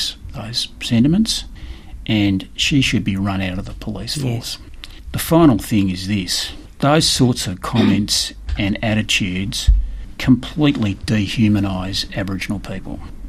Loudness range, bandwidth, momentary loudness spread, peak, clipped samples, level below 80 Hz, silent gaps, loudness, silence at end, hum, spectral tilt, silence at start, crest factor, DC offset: 3 LU; 14.5 kHz; 14 LU; -2 dBFS; under 0.1%; -28 dBFS; none; -18 LUFS; 0 s; none; -4.5 dB/octave; 0 s; 18 dB; under 0.1%